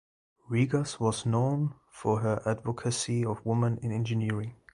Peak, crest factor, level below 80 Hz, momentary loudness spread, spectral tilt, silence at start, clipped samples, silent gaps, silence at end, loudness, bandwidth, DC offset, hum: -12 dBFS; 16 dB; -58 dBFS; 5 LU; -6 dB/octave; 0.5 s; under 0.1%; none; 0.2 s; -30 LUFS; 11 kHz; under 0.1%; none